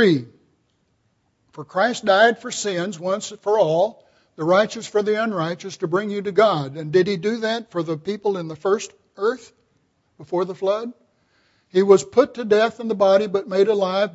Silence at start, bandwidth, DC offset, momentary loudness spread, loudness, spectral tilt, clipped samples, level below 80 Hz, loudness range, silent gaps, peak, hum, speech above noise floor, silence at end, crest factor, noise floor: 0 s; 8 kHz; under 0.1%; 10 LU; -21 LUFS; -5 dB/octave; under 0.1%; -68 dBFS; 6 LU; none; -2 dBFS; none; 47 dB; 0.05 s; 20 dB; -67 dBFS